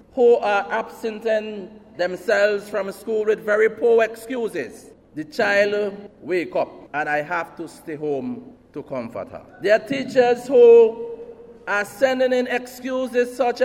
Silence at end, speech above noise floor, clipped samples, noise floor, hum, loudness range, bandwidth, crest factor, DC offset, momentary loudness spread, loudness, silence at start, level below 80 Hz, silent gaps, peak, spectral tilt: 0 s; 20 dB; under 0.1%; -40 dBFS; none; 8 LU; 14 kHz; 16 dB; under 0.1%; 18 LU; -20 LUFS; 0.15 s; -62 dBFS; none; -4 dBFS; -4.5 dB/octave